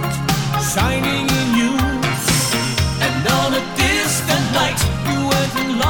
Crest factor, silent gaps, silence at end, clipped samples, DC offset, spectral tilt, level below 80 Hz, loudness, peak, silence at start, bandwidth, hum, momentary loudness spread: 16 dB; none; 0 s; under 0.1%; under 0.1%; -4 dB/octave; -32 dBFS; -17 LUFS; -2 dBFS; 0 s; over 20 kHz; none; 3 LU